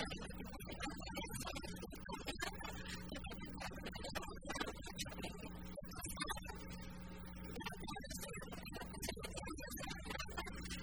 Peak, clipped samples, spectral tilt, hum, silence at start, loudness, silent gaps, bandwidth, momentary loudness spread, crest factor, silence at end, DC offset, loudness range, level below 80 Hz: -26 dBFS; under 0.1%; -3.5 dB/octave; none; 0 s; -48 LUFS; none; over 20 kHz; 6 LU; 22 dB; 0 s; 0.1%; 1 LU; -56 dBFS